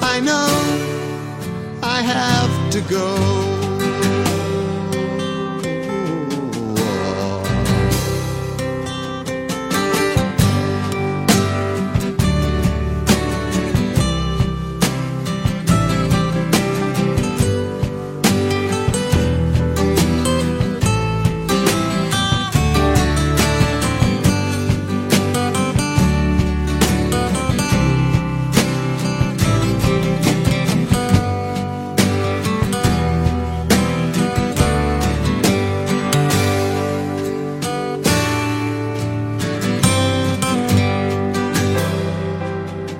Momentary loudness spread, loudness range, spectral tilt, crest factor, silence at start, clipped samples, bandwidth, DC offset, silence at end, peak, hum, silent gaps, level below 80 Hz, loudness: 6 LU; 3 LU; -5.5 dB/octave; 18 dB; 0 s; under 0.1%; 16.5 kHz; under 0.1%; 0 s; 0 dBFS; none; none; -30 dBFS; -18 LUFS